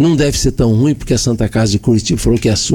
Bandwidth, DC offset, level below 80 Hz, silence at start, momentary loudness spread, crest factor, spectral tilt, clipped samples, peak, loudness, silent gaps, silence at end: 18 kHz; under 0.1%; -26 dBFS; 0 s; 2 LU; 10 dB; -5.5 dB/octave; under 0.1%; -4 dBFS; -13 LUFS; none; 0 s